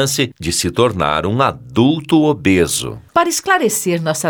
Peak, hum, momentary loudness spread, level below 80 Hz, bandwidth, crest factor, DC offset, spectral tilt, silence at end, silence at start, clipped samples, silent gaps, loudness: 0 dBFS; none; 4 LU; -42 dBFS; over 20 kHz; 16 dB; under 0.1%; -4 dB/octave; 0 s; 0 s; under 0.1%; none; -15 LUFS